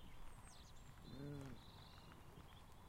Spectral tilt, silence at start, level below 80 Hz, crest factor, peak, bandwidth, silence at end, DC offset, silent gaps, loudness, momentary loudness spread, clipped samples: -5.5 dB/octave; 0 s; -64 dBFS; 16 dB; -42 dBFS; 16 kHz; 0 s; under 0.1%; none; -59 LUFS; 9 LU; under 0.1%